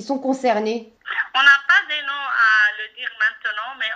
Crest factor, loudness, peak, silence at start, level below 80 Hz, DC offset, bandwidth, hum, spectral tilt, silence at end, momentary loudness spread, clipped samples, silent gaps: 18 dB; -18 LUFS; 0 dBFS; 0 s; -72 dBFS; under 0.1%; 9.2 kHz; none; -2.5 dB/octave; 0 s; 13 LU; under 0.1%; none